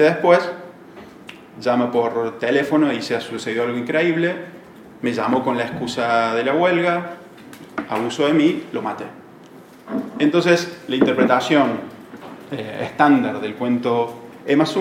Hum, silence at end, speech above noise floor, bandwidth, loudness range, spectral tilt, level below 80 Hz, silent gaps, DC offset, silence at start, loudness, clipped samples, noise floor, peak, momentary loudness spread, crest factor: none; 0 s; 24 dB; 15.5 kHz; 3 LU; -5.5 dB/octave; -66 dBFS; none; under 0.1%; 0 s; -19 LUFS; under 0.1%; -43 dBFS; -2 dBFS; 20 LU; 18 dB